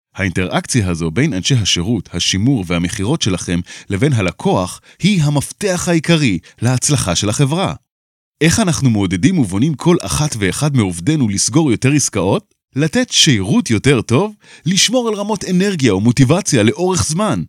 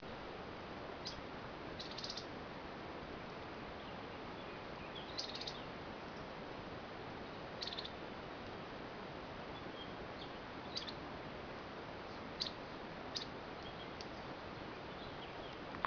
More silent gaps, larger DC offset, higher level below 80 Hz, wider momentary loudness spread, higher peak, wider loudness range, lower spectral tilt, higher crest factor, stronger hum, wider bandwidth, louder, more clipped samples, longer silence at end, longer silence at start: first, 7.91-8.33 s vs none; neither; first, -42 dBFS vs -64 dBFS; about the same, 6 LU vs 5 LU; first, 0 dBFS vs -18 dBFS; about the same, 3 LU vs 1 LU; first, -4.5 dB/octave vs -2.5 dB/octave; second, 14 dB vs 30 dB; neither; first, 16 kHz vs 5.4 kHz; first, -15 LUFS vs -47 LUFS; neither; about the same, 0 s vs 0 s; first, 0.15 s vs 0 s